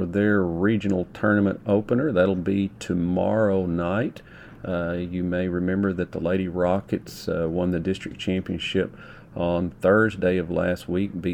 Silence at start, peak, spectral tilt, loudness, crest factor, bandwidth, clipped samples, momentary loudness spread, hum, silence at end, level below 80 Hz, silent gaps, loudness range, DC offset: 0 s; -6 dBFS; -7.5 dB/octave; -24 LUFS; 18 dB; 18.5 kHz; under 0.1%; 8 LU; none; 0 s; -50 dBFS; none; 4 LU; under 0.1%